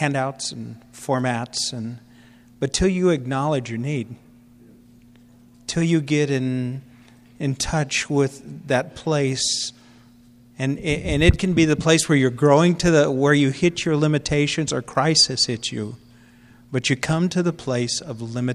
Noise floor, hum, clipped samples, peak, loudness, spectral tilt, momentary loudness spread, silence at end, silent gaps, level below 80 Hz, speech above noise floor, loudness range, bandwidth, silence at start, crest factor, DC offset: -50 dBFS; none; under 0.1%; -2 dBFS; -21 LUFS; -4.5 dB/octave; 13 LU; 0 s; none; -40 dBFS; 30 dB; 7 LU; 13 kHz; 0 s; 20 dB; under 0.1%